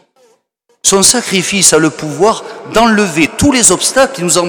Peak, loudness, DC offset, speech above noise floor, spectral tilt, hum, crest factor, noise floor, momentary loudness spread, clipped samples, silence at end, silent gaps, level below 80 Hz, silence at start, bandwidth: 0 dBFS; -9 LUFS; under 0.1%; 47 dB; -2.5 dB/octave; none; 12 dB; -58 dBFS; 6 LU; 0.5%; 0 s; none; -38 dBFS; 0.85 s; over 20 kHz